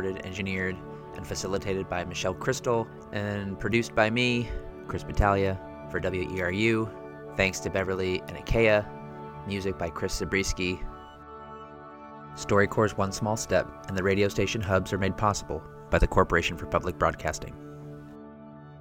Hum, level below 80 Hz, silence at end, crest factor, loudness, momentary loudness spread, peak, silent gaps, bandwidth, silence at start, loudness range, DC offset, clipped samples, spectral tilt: none; -40 dBFS; 0 s; 24 dB; -28 LUFS; 19 LU; -6 dBFS; none; 17 kHz; 0 s; 4 LU; under 0.1%; under 0.1%; -5 dB/octave